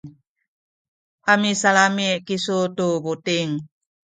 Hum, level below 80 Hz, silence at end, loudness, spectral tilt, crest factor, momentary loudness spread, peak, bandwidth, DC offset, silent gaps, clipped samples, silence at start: none; -68 dBFS; 0.4 s; -20 LUFS; -3.5 dB/octave; 20 dB; 9 LU; -2 dBFS; 9.6 kHz; under 0.1%; 0.27-0.36 s, 0.48-1.18 s; under 0.1%; 0.05 s